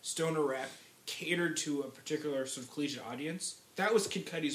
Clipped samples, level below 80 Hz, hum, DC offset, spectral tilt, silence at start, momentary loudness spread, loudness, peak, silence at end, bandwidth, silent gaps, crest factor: under 0.1%; -86 dBFS; none; under 0.1%; -3.5 dB/octave; 0.05 s; 9 LU; -36 LUFS; -16 dBFS; 0 s; 16 kHz; none; 20 dB